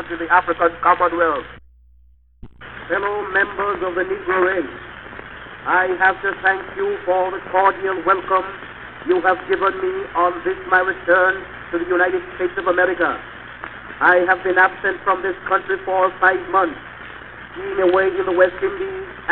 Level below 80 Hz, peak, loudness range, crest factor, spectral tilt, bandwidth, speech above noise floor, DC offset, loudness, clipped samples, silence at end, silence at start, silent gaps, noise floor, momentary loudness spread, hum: -50 dBFS; -2 dBFS; 4 LU; 18 dB; -7.5 dB/octave; 4.3 kHz; 34 dB; 0.1%; -18 LUFS; under 0.1%; 0 s; 0 s; none; -52 dBFS; 18 LU; none